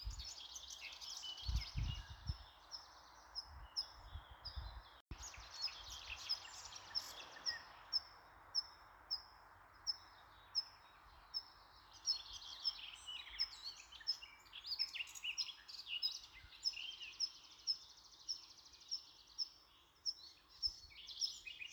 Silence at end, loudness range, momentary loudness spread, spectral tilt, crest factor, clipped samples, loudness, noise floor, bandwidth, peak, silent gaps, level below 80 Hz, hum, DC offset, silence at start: 0 s; 5 LU; 17 LU; -1 dB/octave; 20 dB; under 0.1%; -45 LUFS; -68 dBFS; over 20 kHz; -28 dBFS; 5.01-5.07 s; -58 dBFS; none; under 0.1%; 0 s